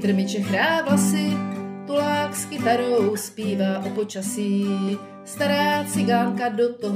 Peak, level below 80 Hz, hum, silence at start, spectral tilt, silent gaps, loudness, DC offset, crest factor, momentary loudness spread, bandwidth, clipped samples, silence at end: -8 dBFS; -70 dBFS; none; 0 s; -5 dB/octave; none; -23 LUFS; under 0.1%; 14 dB; 7 LU; 16 kHz; under 0.1%; 0 s